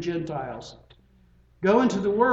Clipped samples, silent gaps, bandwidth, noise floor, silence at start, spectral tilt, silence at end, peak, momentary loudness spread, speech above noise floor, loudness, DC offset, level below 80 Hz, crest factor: under 0.1%; none; 8 kHz; -58 dBFS; 0 s; -6.5 dB/octave; 0 s; -6 dBFS; 18 LU; 34 dB; -24 LUFS; under 0.1%; -56 dBFS; 20 dB